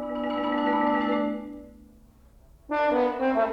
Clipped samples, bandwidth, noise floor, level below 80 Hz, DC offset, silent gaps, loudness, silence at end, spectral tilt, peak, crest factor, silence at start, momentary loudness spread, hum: under 0.1%; 6.4 kHz; -54 dBFS; -56 dBFS; under 0.1%; none; -26 LUFS; 0 s; -6.5 dB/octave; -12 dBFS; 14 dB; 0 s; 11 LU; none